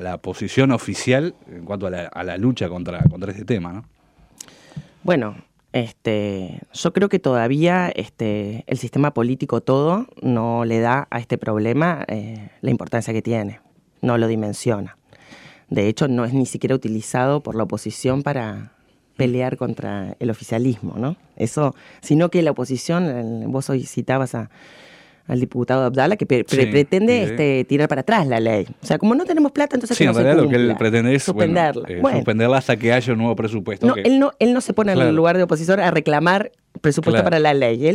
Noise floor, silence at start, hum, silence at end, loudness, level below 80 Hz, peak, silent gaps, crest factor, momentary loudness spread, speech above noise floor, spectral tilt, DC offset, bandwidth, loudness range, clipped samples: -45 dBFS; 0 s; none; 0 s; -19 LUFS; -52 dBFS; 0 dBFS; none; 18 dB; 11 LU; 27 dB; -6.5 dB/octave; under 0.1%; 13.5 kHz; 7 LU; under 0.1%